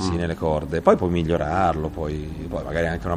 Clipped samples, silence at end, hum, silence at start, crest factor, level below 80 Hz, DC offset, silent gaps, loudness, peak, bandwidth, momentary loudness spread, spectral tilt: under 0.1%; 0 s; none; 0 s; 20 dB; -36 dBFS; under 0.1%; none; -23 LUFS; -2 dBFS; 12.5 kHz; 10 LU; -7 dB/octave